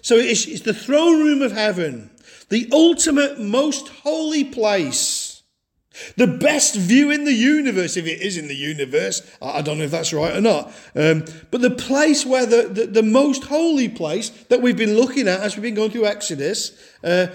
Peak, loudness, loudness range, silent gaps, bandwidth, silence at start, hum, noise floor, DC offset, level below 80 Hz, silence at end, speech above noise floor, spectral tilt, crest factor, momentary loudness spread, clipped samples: -4 dBFS; -18 LUFS; 3 LU; none; 17 kHz; 0.05 s; none; -69 dBFS; under 0.1%; -60 dBFS; 0 s; 51 dB; -3.5 dB/octave; 16 dB; 10 LU; under 0.1%